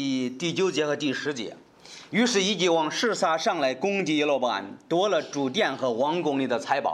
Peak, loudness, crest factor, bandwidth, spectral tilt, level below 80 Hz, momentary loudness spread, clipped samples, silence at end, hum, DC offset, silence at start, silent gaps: -8 dBFS; -25 LUFS; 16 dB; 12.5 kHz; -4 dB/octave; -76 dBFS; 7 LU; under 0.1%; 0 s; none; under 0.1%; 0 s; none